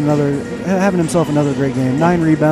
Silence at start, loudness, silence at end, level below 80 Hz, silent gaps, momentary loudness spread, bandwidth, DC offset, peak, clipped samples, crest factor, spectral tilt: 0 s; -15 LUFS; 0 s; -44 dBFS; none; 5 LU; 14 kHz; under 0.1%; -2 dBFS; under 0.1%; 12 dB; -7 dB/octave